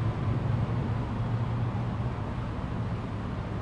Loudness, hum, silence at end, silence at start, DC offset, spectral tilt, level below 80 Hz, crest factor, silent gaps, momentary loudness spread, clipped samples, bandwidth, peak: -32 LUFS; none; 0 s; 0 s; under 0.1%; -8.5 dB/octave; -40 dBFS; 14 dB; none; 5 LU; under 0.1%; 7 kHz; -16 dBFS